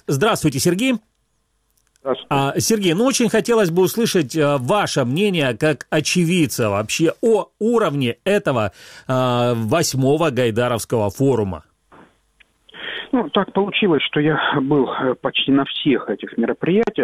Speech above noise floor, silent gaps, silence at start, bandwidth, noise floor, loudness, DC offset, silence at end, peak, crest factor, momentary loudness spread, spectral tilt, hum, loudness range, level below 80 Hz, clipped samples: 48 dB; none; 0.1 s; 16.5 kHz; -66 dBFS; -18 LUFS; under 0.1%; 0 s; -2 dBFS; 16 dB; 6 LU; -5 dB/octave; none; 4 LU; -54 dBFS; under 0.1%